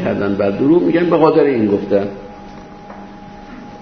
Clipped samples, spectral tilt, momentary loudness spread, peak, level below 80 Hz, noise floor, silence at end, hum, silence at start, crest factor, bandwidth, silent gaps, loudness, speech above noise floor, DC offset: under 0.1%; -9 dB/octave; 23 LU; 0 dBFS; -46 dBFS; -34 dBFS; 0 s; none; 0 s; 16 dB; 6.4 kHz; none; -14 LUFS; 21 dB; under 0.1%